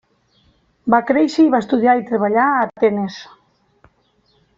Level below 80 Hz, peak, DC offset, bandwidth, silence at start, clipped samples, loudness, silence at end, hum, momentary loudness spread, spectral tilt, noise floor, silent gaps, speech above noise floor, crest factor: -60 dBFS; -2 dBFS; under 0.1%; 7.6 kHz; 0.85 s; under 0.1%; -16 LUFS; 1.35 s; none; 11 LU; -6.5 dB/octave; -60 dBFS; none; 45 dB; 16 dB